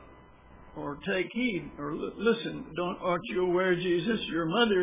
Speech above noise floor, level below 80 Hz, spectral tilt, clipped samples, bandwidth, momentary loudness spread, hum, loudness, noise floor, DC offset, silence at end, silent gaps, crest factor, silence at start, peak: 24 dB; -58 dBFS; -3.5 dB/octave; under 0.1%; 3.8 kHz; 10 LU; none; -30 LUFS; -53 dBFS; under 0.1%; 0 s; none; 18 dB; 0 s; -12 dBFS